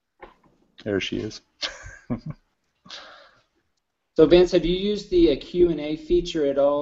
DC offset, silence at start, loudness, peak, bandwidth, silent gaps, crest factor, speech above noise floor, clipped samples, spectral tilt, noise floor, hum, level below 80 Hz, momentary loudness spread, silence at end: under 0.1%; 0.2 s; -22 LUFS; -2 dBFS; 7.6 kHz; none; 20 dB; 55 dB; under 0.1%; -6 dB/octave; -76 dBFS; none; -42 dBFS; 23 LU; 0 s